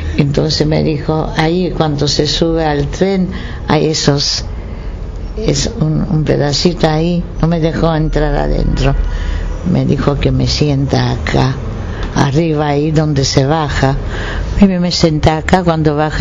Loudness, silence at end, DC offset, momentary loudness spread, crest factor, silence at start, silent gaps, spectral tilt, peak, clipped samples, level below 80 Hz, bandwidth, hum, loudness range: -14 LUFS; 0 s; under 0.1%; 8 LU; 12 dB; 0 s; none; -5.5 dB/octave; 0 dBFS; 0.2%; -22 dBFS; 7.6 kHz; none; 2 LU